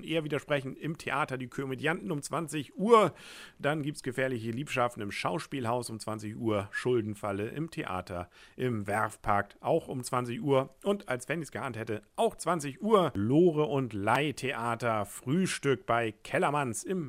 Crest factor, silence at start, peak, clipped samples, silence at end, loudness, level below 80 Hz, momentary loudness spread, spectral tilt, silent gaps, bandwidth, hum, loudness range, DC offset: 22 dB; 0 s; -8 dBFS; under 0.1%; 0 s; -31 LUFS; -62 dBFS; 10 LU; -5.5 dB/octave; none; 16 kHz; none; 5 LU; under 0.1%